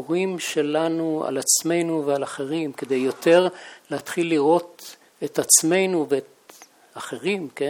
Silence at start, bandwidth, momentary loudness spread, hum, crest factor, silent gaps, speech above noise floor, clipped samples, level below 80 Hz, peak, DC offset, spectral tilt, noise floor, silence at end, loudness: 0 s; 18.5 kHz; 16 LU; none; 20 dB; none; 27 dB; under 0.1%; -76 dBFS; -2 dBFS; under 0.1%; -3 dB/octave; -50 dBFS; 0 s; -21 LUFS